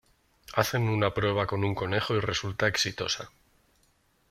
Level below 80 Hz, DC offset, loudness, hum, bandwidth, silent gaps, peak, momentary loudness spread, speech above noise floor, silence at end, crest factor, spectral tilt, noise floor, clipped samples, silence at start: -56 dBFS; under 0.1%; -28 LUFS; none; 16 kHz; none; -6 dBFS; 5 LU; 40 dB; 1.05 s; 22 dB; -4.5 dB/octave; -68 dBFS; under 0.1%; 0.5 s